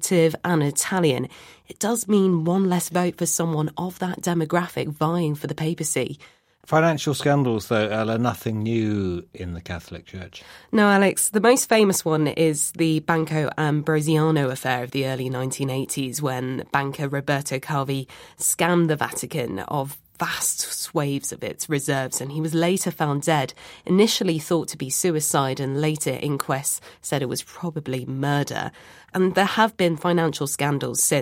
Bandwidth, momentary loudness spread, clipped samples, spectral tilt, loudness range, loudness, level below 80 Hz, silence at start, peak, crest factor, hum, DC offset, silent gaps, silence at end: 16.5 kHz; 10 LU; under 0.1%; -4.5 dB/octave; 5 LU; -23 LUFS; -58 dBFS; 0 s; -4 dBFS; 18 dB; none; under 0.1%; none; 0 s